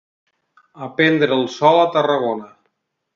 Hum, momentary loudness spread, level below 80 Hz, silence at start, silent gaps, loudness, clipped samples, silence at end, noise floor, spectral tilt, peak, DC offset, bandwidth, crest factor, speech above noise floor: none; 14 LU; -66 dBFS; 0.75 s; none; -17 LUFS; under 0.1%; 0.7 s; -71 dBFS; -6 dB/octave; 0 dBFS; under 0.1%; 7.4 kHz; 18 dB; 54 dB